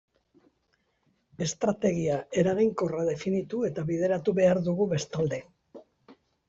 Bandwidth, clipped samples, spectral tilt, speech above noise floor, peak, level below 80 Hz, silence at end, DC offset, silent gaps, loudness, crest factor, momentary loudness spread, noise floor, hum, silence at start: 8 kHz; under 0.1%; -6 dB/octave; 46 dB; -12 dBFS; -62 dBFS; 0.35 s; under 0.1%; none; -28 LUFS; 16 dB; 7 LU; -73 dBFS; none; 1.4 s